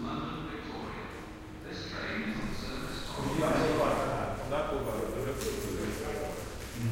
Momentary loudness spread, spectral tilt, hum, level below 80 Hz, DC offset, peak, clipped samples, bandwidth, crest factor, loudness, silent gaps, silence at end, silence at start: 12 LU; -5.5 dB/octave; none; -46 dBFS; under 0.1%; -16 dBFS; under 0.1%; 16 kHz; 18 dB; -34 LUFS; none; 0 s; 0 s